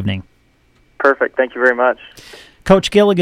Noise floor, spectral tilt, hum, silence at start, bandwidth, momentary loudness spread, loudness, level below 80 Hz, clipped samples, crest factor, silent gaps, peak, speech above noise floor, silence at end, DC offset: -55 dBFS; -5.5 dB/octave; none; 0 s; 13.5 kHz; 15 LU; -15 LUFS; -42 dBFS; under 0.1%; 16 dB; none; 0 dBFS; 41 dB; 0 s; under 0.1%